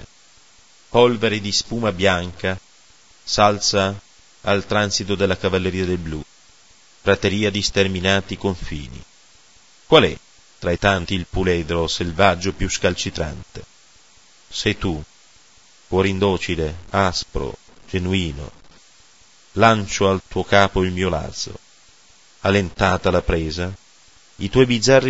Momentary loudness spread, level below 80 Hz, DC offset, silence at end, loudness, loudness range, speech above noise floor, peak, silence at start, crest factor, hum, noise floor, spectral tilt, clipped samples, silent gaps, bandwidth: 15 LU; -38 dBFS; 0.8%; 0 s; -20 LUFS; 4 LU; 33 dB; 0 dBFS; 0 s; 20 dB; none; -52 dBFS; -4.5 dB/octave; under 0.1%; none; 8 kHz